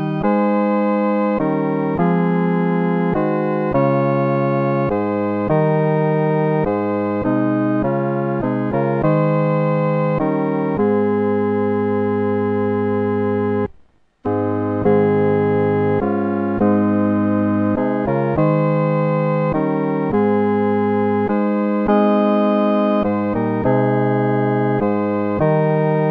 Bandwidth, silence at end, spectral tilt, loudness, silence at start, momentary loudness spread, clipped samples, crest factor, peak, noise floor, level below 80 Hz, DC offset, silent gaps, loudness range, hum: 4.9 kHz; 0 s; -11 dB/octave; -18 LUFS; 0 s; 3 LU; under 0.1%; 12 dB; -4 dBFS; -51 dBFS; -48 dBFS; under 0.1%; none; 2 LU; none